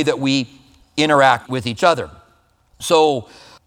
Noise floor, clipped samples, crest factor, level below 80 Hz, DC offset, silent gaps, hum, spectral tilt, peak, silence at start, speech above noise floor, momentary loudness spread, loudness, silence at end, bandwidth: -57 dBFS; under 0.1%; 18 dB; -54 dBFS; under 0.1%; none; none; -4.5 dB/octave; 0 dBFS; 0 s; 40 dB; 15 LU; -17 LUFS; 0.45 s; 16.5 kHz